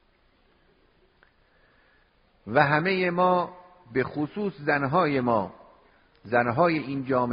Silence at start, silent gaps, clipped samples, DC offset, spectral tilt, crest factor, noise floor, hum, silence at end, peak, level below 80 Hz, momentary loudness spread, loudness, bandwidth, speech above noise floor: 2.45 s; none; under 0.1%; under 0.1%; -5 dB/octave; 22 dB; -64 dBFS; none; 0 s; -4 dBFS; -62 dBFS; 8 LU; -25 LUFS; 5.2 kHz; 39 dB